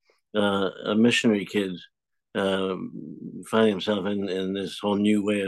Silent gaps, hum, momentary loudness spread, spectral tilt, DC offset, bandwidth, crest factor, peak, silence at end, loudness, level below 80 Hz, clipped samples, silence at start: none; none; 13 LU; -5.5 dB/octave; under 0.1%; 12.5 kHz; 16 dB; -8 dBFS; 0 s; -25 LUFS; -72 dBFS; under 0.1%; 0.35 s